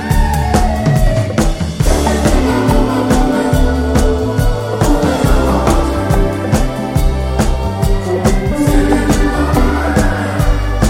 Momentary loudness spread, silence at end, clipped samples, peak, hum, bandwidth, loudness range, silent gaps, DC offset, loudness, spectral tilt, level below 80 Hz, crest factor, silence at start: 3 LU; 0 s; under 0.1%; 0 dBFS; none; 16.5 kHz; 1 LU; none; under 0.1%; -14 LUFS; -6 dB/octave; -16 dBFS; 12 dB; 0 s